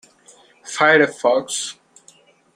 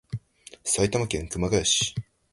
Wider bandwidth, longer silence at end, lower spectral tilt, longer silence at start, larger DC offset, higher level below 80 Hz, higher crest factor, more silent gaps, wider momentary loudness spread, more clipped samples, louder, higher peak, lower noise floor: first, 15.5 kHz vs 12 kHz; first, 0.85 s vs 0.3 s; about the same, -2.5 dB/octave vs -3 dB/octave; first, 0.65 s vs 0.1 s; neither; second, -70 dBFS vs -44 dBFS; about the same, 20 dB vs 18 dB; neither; about the same, 15 LU vs 16 LU; neither; first, -17 LUFS vs -25 LUFS; first, -2 dBFS vs -8 dBFS; first, -53 dBFS vs -49 dBFS